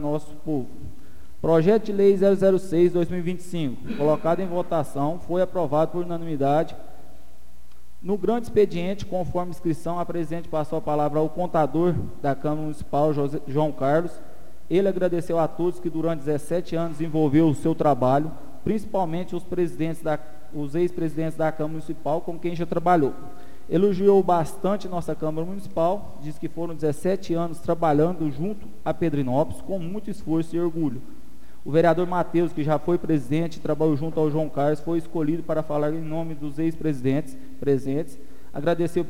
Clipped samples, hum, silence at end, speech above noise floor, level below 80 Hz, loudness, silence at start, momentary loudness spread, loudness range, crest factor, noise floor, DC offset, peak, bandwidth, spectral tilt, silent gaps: under 0.1%; none; 0 s; 29 dB; -50 dBFS; -24 LUFS; 0 s; 10 LU; 5 LU; 18 dB; -53 dBFS; 4%; -8 dBFS; 16 kHz; -8 dB/octave; none